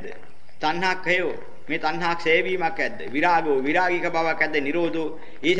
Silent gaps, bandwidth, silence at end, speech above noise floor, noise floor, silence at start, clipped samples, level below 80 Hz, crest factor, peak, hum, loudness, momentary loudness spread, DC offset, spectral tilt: none; 10.5 kHz; 0 s; 22 dB; -46 dBFS; 0 s; under 0.1%; -60 dBFS; 18 dB; -6 dBFS; none; -23 LUFS; 10 LU; 3%; -5 dB/octave